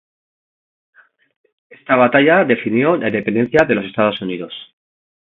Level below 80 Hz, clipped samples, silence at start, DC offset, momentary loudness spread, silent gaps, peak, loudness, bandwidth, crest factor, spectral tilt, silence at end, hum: -56 dBFS; under 0.1%; 1.9 s; under 0.1%; 14 LU; none; 0 dBFS; -15 LUFS; 7.4 kHz; 18 dB; -7.5 dB/octave; 0.55 s; none